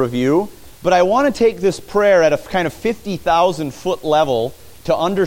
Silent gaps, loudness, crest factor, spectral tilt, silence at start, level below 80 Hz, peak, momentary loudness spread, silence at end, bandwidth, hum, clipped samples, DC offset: none; -17 LUFS; 14 dB; -5.5 dB/octave; 0 s; -46 dBFS; -2 dBFS; 9 LU; 0 s; 17 kHz; none; under 0.1%; under 0.1%